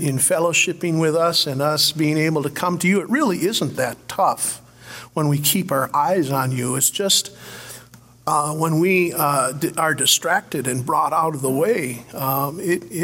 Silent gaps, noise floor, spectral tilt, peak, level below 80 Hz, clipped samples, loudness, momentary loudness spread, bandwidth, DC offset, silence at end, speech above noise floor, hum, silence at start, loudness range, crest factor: none; -46 dBFS; -3.5 dB/octave; -2 dBFS; -62 dBFS; under 0.1%; -19 LUFS; 9 LU; 16.5 kHz; under 0.1%; 0 s; 26 dB; none; 0 s; 2 LU; 18 dB